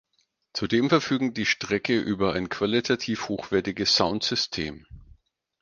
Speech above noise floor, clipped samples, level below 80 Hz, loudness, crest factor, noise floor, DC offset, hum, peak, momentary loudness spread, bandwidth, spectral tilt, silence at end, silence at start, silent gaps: 47 dB; under 0.1%; -54 dBFS; -25 LUFS; 22 dB; -72 dBFS; under 0.1%; none; -4 dBFS; 8 LU; 9.8 kHz; -4 dB/octave; 0.6 s; 0.55 s; none